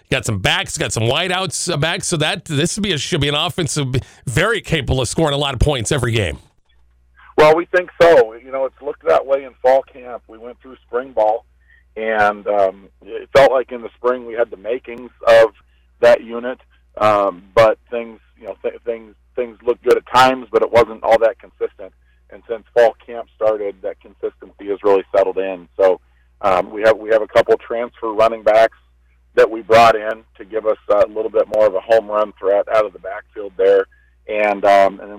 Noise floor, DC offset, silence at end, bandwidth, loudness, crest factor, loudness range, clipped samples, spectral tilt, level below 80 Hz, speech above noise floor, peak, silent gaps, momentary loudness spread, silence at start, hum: -54 dBFS; under 0.1%; 0 s; 16 kHz; -16 LUFS; 12 dB; 4 LU; under 0.1%; -4.5 dB/octave; -40 dBFS; 38 dB; -4 dBFS; none; 16 LU; 0.1 s; none